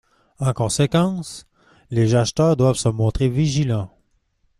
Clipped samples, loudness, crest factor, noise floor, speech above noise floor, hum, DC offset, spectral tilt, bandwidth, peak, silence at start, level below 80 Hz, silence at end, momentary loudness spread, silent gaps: under 0.1%; -20 LUFS; 16 dB; -64 dBFS; 46 dB; none; under 0.1%; -6 dB/octave; 13 kHz; -4 dBFS; 0.4 s; -40 dBFS; 0.7 s; 11 LU; none